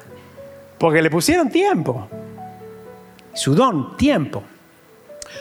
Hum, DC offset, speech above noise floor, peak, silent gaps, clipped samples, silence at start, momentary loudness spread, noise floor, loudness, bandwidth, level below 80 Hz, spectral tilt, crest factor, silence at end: none; under 0.1%; 32 dB; -4 dBFS; none; under 0.1%; 0.1 s; 23 LU; -49 dBFS; -18 LUFS; over 20 kHz; -50 dBFS; -5 dB/octave; 18 dB; 0 s